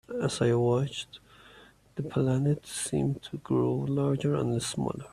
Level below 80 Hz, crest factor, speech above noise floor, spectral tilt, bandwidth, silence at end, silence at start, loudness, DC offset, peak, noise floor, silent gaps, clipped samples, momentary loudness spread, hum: -58 dBFS; 16 dB; 27 dB; -6 dB/octave; 14 kHz; 0.05 s; 0.1 s; -29 LUFS; under 0.1%; -14 dBFS; -56 dBFS; none; under 0.1%; 11 LU; none